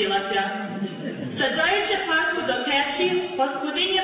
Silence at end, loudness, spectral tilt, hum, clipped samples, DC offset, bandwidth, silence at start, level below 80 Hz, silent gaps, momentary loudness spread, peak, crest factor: 0 s; -23 LUFS; -7.5 dB/octave; none; under 0.1%; under 0.1%; 4 kHz; 0 s; -60 dBFS; none; 10 LU; -10 dBFS; 14 dB